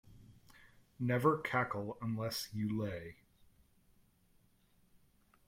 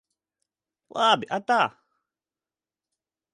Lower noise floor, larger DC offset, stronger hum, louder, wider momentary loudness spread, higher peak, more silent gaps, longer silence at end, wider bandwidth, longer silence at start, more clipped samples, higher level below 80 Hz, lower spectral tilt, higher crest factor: second, -71 dBFS vs under -90 dBFS; neither; neither; second, -37 LUFS vs -23 LUFS; first, 10 LU vs 6 LU; second, -18 dBFS vs -6 dBFS; neither; first, 2.35 s vs 1.65 s; first, 16.5 kHz vs 10.5 kHz; second, 0.1 s vs 0.95 s; neither; first, -68 dBFS vs -80 dBFS; first, -6 dB/octave vs -3.5 dB/octave; about the same, 22 dB vs 24 dB